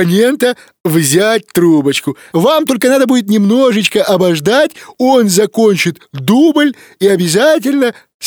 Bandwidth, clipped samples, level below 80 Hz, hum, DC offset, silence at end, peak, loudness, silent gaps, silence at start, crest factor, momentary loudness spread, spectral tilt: over 20 kHz; under 0.1%; -58 dBFS; none; under 0.1%; 0 s; 0 dBFS; -11 LUFS; 0.80-0.84 s, 8.14-8.20 s; 0 s; 10 dB; 6 LU; -4.5 dB/octave